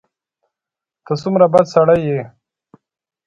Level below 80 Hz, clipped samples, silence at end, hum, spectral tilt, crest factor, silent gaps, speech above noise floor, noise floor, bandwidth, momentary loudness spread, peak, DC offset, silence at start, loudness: -54 dBFS; under 0.1%; 1 s; none; -7.5 dB/octave; 18 dB; none; 73 dB; -87 dBFS; 7.8 kHz; 12 LU; 0 dBFS; under 0.1%; 1.1 s; -15 LUFS